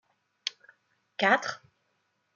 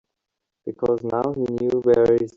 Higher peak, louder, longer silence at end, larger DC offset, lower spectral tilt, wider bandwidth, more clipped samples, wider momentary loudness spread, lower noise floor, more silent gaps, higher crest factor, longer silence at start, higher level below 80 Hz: second, -10 dBFS vs -6 dBFS; second, -29 LUFS vs -21 LUFS; first, 0.8 s vs 0.05 s; neither; second, -3 dB/octave vs -8.5 dB/octave; about the same, 7.6 kHz vs 7.6 kHz; neither; first, 19 LU vs 13 LU; second, -76 dBFS vs -83 dBFS; neither; first, 24 dB vs 16 dB; second, 0.45 s vs 0.65 s; second, -86 dBFS vs -54 dBFS